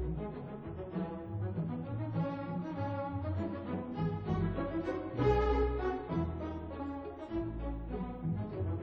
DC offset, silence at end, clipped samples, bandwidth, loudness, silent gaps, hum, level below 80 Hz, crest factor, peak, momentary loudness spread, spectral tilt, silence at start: under 0.1%; 0 s; under 0.1%; 6.6 kHz; -37 LUFS; none; none; -44 dBFS; 18 dB; -18 dBFS; 9 LU; -9.5 dB/octave; 0 s